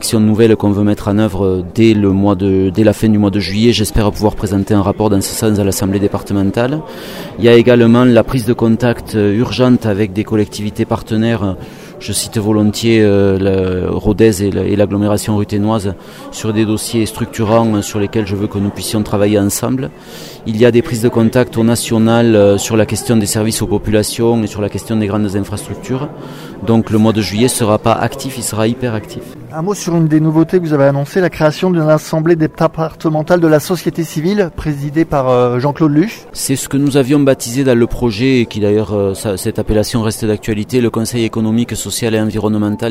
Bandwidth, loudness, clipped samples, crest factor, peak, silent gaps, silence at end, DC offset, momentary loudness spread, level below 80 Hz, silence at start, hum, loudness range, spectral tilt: 16.5 kHz; -13 LUFS; under 0.1%; 12 dB; 0 dBFS; none; 0 s; under 0.1%; 9 LU; -34 dBFS; 0 s; none; 4 LU; -6 dB/octave